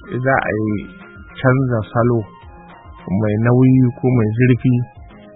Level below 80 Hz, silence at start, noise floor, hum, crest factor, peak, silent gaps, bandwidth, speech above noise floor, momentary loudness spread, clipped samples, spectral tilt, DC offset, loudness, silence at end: -44 dBFS; 0 s; -39 dBFS; none; 16 dB; 0 dBFS; none; 3.9 kHz; 24 dB; 16 LU; under 0.1%; -13.5 dB/octave; under 0.1%; -16 LUFS; 0.25 s